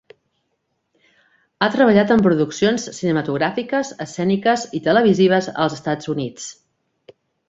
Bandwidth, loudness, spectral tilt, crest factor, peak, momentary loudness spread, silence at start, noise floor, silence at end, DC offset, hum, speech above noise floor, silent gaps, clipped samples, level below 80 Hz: 8 kHz; -18 LUFS; -5.5 dB/octave; 18 dB; -2 dBFS; 11 LU; 1.6 s; -72 dBFS; 0.95 s; under 0.1%; none; 54 dB; none; under 0.1%; -58 dBFS